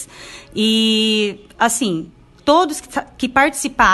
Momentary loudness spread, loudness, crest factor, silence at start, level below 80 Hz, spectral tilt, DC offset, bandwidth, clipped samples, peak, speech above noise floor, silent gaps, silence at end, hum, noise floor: 13 LU; -17 LUFS; 18 dB; 0 s; -44 dBFS; -2.5 dB/octave; under 0.1%; 13 kHz; under 0.1%; 0 dBFS; 21 dB; none; 0 s; none; -38 dBFS